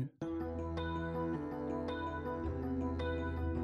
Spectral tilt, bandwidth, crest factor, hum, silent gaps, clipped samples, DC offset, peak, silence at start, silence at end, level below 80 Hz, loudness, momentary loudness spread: -8.5 dB/octave; 7 kHz; 12 dB; none; none; under 0.1%; under 0.1%; -26 dBFS; 0 s; 0 s; -48 dBFS; -39 LUFS; 2 LU